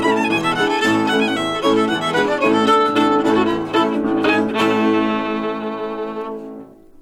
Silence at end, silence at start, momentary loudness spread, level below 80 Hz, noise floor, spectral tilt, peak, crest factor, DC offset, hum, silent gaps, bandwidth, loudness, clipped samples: 0.35 s; 0 s; 11 LU; -52 dBFS; -38 dBFS; -5 dB/octave; -4 dBFS; 14 dB; under 0.1%; none; none; 14 kHz; -17 LUFS; under 0.1%